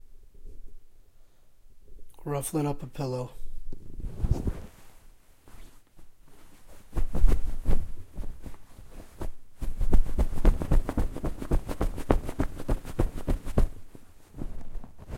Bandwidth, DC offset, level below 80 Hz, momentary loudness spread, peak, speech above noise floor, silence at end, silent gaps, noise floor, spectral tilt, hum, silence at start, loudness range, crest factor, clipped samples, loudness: 13.5 kHz; under 0.1%; -30 dBFS; 22 LU; -4 dBFS; 21 dB; 0 s; none; -52 dBFS; -7 dB/octave; none; 0.05 s; 7 LU; 22 dB; under 0.1%; -33 LUFS